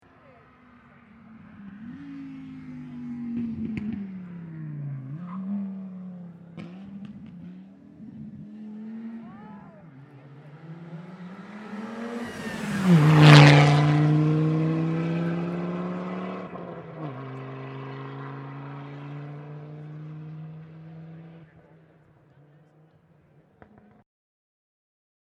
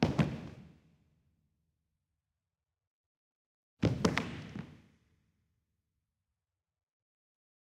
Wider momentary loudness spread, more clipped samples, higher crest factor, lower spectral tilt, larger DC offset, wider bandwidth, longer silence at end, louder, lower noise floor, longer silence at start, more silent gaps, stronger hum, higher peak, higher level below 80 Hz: first, 24 LU vs 20 LU; neither; about the same, 26 dB vs 30 dB; about the same, -7 dB/octave vs -6 dB/octave; neither; second, 11 kHz vs 13 kHz; first, 3.85 s vs 2.9 s; first, -22 LUFS vs -35 LUFS; second, -59 dBFS vs under -90 dBFS; first, 1.3 s vs 0 s; second, none vs 2.87-3.77 s; neither; first, 0 dBFS vs -12 dBFS; about the same, -62 dBFS vs -60 dBFS